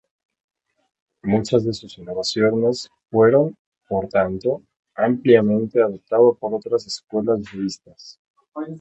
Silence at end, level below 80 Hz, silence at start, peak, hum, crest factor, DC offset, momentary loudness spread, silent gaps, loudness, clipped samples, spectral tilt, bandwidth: 0 s; -56 dBFS; 1.25 s; -2 dBFS; none; 20 dB; under 0.1%; 15 LU; 3.59-3.72 s, 4.79-4.83 s, 7.04-7.08 s, 8.19-8.34 s, 8.48-8.52 s; -20 LUFS; under 0.1%; -6 dB/octave; 8.4 kHz